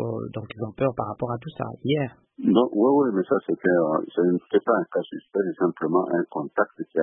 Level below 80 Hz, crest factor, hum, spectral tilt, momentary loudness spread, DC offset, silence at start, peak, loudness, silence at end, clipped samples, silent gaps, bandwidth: -64 dBFS; 18 dB; none; -11.5 dB/octave; 11 LU; under 0.1%; 0 s; -6 dBFS; -24 LUFS; 0 s; under 0.1%; none; 4 kHz